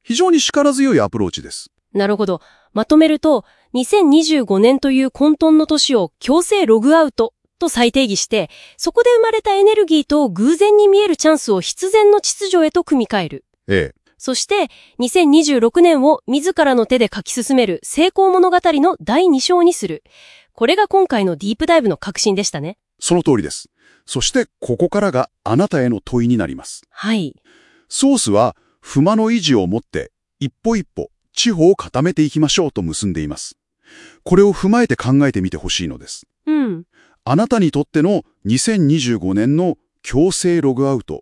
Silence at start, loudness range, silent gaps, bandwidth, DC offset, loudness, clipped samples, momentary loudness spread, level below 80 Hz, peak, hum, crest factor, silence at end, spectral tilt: 0.1 s; 5 LU; none; 12 kHz; under 0.1%; -15 LUFS; under 0.1%; 13 LU; -44 dBFS; 0 dBFS; none; 16 dB; 0 s; -4.5 dB/octave